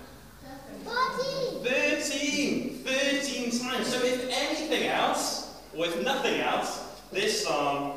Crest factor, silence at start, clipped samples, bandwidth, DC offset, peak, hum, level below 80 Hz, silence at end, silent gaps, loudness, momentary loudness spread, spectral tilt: 16 dB; 0 s; under 0.1%; 15.5 kHz; 0.1%; -14 dBFS; none; -58 dBFS; 0 s; none; -28 LUFS; 9 LU; -2.5 dB/octave